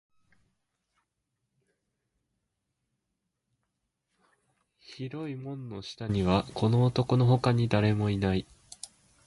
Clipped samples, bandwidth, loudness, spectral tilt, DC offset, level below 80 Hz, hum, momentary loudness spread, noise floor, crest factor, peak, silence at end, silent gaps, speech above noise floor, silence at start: under 0.1%; 11.5 kHz; -27 LUFS; -7.5 dB/octave; under 0.1%; -52 dBFS; none; 21 LU; -83 dBFS; 20 dB; -10 dBFS; 0.4 s; none; 56 dB; 4.9 s